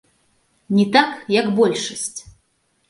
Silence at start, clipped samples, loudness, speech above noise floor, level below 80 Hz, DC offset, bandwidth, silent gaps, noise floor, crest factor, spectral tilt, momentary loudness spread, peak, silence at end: 0.7 s; under 0.1%; -18 LUFS; 48 dB; -60 dBFS; under 0.1%; 11.5 kHz; none; -66 dBFS; 20 dB; -4.5 dB/octave; 12 LU; 0 dBFS; 0.7 s